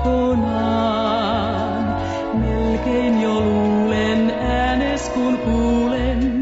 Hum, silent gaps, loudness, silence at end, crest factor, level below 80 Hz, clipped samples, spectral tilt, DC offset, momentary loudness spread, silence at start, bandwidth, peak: none; none; -19 LUFS; 0 s; 10 dB; -30 dBFS; under 0.1%; -6.5 dB/octave; under 0.1%; 4 LU; 0 s; 8 kHz; -8 dBFS